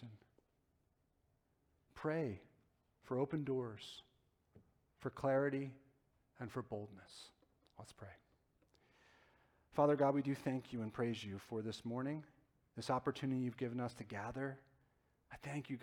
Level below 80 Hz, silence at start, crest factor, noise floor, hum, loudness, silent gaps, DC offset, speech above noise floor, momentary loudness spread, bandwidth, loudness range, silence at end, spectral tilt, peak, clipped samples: -74 dBFS; 0 s; 22 dB; -80 dBFS; none; -42 LUFS; none; under 0.1%; 39 dB; 21 LU; 15.5 kHz; 11 LU; 0 s; -7 dB/octave; -22 dBFS; under 0.1%